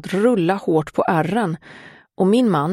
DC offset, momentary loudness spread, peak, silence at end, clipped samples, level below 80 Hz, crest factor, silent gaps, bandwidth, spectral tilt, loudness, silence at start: under 0.1%; 6 LU; -4 dBFS; 0 s; under 0.1%; -58 dBFS; 16 dB; none; 13 kHz; -7 dB/octave; -19 LUFS; 0.05 s